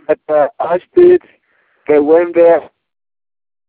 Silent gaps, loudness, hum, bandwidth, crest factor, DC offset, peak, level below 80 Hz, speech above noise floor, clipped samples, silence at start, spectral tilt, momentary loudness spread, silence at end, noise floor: none; -11 LUFS; none; 4.1 kHz; 12 dB; under 0.1%; 0 dBFS; -56 dBFS; 48 dB; under 0.1%; 0.1 s; -10.5 dB/octave; 7 LU; 1.05 s; -58 dBFS